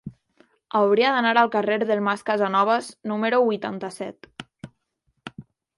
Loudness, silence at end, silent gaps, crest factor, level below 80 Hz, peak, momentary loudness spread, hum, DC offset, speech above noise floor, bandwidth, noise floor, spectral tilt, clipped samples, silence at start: -22 LUFS; 0.35 s; none; 20 dB; -68 dBFS; -4 dBFS; 23 LU; none; under 0.1%; 51 dB; 11.5 kHz; -72 dBFS; -5 dB/octave; under 0.1%; 0.05 s